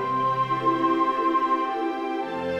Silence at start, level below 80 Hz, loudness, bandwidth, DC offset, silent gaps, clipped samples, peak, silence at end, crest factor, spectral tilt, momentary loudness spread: 0 s; -64 dBFS; -24 LUFS; 9 kHz; under 0.1%; none; under 0.1%; -12 dBFS; 0 s; 14 dB; -7 dB/octave; 6 LU